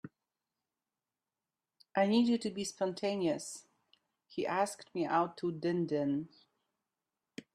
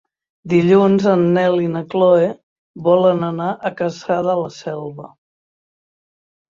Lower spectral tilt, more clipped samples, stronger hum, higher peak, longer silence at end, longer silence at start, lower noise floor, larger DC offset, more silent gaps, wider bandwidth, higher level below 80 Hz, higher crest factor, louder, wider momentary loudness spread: second, -5 dB/octave vs -8 dB/octave; neither; neither; second, -18 dBFS vs -2 dBFS; second, 0.15 s vs 1.5 s; second, 0.05 s vs 0.45 s; about the same, under -90 dBFS vs under -90 dBFS; neither; second, none vs 2.43-2.74 s; first, 13 kHz vs 7.4 kHz; second, -80 dBFS vs -60 dBFS; about the same, 18 dB vs 16 dB; second, -34 LUFS vs -16 LUFS; first, 18 LU vs 14 LU